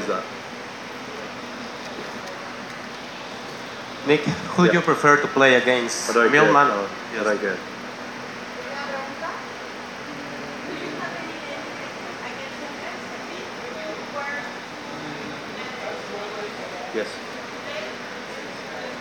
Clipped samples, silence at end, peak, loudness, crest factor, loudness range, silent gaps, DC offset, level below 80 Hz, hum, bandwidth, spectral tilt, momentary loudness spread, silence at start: under 0.1%; 0 s; -2 dBFS; -25 LUFS; 24 dB; 14 LU; none; under 0.1%; -64 dBFS; none; 17 kHz; -4 dB/octave; 17 LU; 0 s